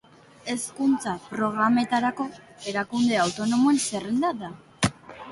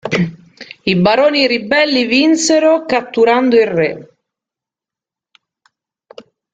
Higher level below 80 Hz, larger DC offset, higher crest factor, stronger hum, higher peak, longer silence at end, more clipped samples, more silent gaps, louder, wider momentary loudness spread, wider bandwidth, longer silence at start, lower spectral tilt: about the same, -56 dBFS vs -54 dBFS; neither; about the same, 18 dB vs 14 dB; neither; second, -8 dBFS vs 0 dBFS; second, 0 s vs 2.5 s; neither; neither; second, -25 LUFS vs -13 LUFS; first, 13 LU vs 7 LU; first, 11.5 kHz vs 9.4 kHz; first, 0.45 s vs 0.05 s; about the same, -4 dB/octave vs -4.5 dB/octave